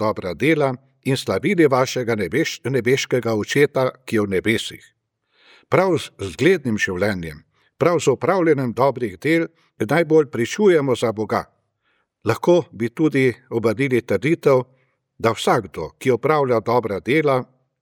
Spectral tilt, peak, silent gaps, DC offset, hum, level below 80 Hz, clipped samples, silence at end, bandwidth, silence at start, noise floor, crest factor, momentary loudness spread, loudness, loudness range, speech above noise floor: -6 dB/octave; -2 dBFS; none; under 0.1%; none; -56 dBFS; under 0.1%; 0.4 s; 17.5 kHz; 0 s; -68 dBFS; 18 dB; 7 LU; -20 LUFS; 2 LU; 49 dB